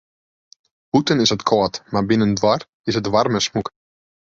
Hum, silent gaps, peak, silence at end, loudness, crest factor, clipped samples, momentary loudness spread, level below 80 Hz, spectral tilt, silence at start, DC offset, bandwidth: none; 2.69-2.84 s; -2 dBFS; 0.55 s; -19 LUFS; 18 dB; under 0.1%; 7 LU; -50 dBFS; -5 dB/octave; 0.95 s; under 0.1%; 7.8 kHz